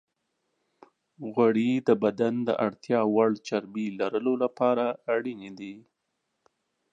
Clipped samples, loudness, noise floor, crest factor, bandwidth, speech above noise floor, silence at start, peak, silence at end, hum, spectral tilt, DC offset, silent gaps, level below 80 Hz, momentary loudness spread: under 0.1%; -26 LUFS; -80 dBFS; 20 dB; 7.8 kHz; 54 dB; 1.2 s; -8 dBFS; 1.15 s; none; -7 dB/octave; under 0.1%; none; -76 dBFS; 14 LU